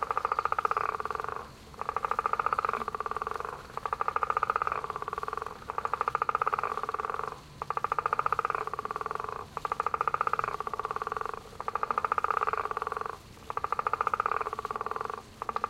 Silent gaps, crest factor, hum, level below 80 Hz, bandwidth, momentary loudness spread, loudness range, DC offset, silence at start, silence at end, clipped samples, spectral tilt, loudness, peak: none; 22 dB; none; -58 dBFS; 16 kHz; 9 LU; 2 LU; under 0.1%; 0 s; 0 s; under 0.1%; -4 dB/octave; -32 LUFS; -12 dBFS